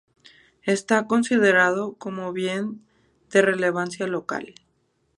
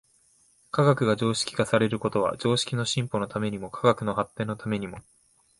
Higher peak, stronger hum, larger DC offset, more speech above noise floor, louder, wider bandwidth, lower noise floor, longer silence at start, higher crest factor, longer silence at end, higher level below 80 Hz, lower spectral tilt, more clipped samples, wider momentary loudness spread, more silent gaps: about the same, -4 dBFS vs -6 dBFS; neither; neither; first, 46 dB vs 37 dB; first, -23 LUFS vs -26 LUFS; about the same, 11.5 kHz vs 11.5 kHz; first, -69 dBFS vs -63 dBFS; about the same, 0.65 s vs 0.75 s; about the same, 20 dB vs 20 dB; about the same, 0.65 s vs 0.6 s; second, -70 dBFS vs -58 dBFS; about the same, -4.5 dB/octave vs -5.5 dB/octave; neither; first, 14 LU vs 9 LU; neither